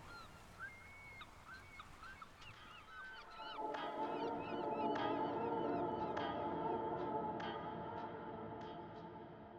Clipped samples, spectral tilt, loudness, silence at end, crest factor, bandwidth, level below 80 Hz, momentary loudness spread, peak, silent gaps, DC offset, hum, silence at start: under 0.1%; -6.5 dB/octave; -44 LUFS; 0 s; 18 dB; 16 kHz; -70 dBFS; 15 LU; -28 dBFS; none; under 0.1%; none; 0 s